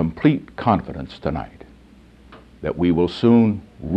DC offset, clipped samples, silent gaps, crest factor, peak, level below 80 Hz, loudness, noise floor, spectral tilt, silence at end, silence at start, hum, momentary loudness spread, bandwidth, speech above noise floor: under 0.1%; under 0.1%; none; 18 dB; -2 dBFS; -42 dBFS; -20 LUFS; -48 dBFS; -9 dB/octave; 0 s; 0 s; none; 15 LU; 7.8 kHz; 29 dB